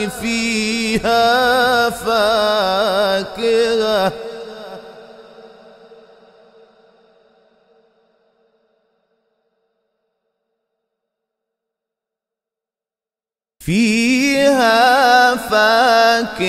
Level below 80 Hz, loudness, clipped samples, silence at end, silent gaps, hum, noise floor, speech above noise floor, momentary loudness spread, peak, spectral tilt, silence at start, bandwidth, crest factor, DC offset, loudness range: -48 dBFS; -14 LUFS; under 0.1%; 0 s; none; none; under -90 dBFS; over 75 dB; 14 LU; 0 dBFS; -3.5 dB/octave; 0 s; 16 kHz; 18 dB; under 0.1%; 12 LU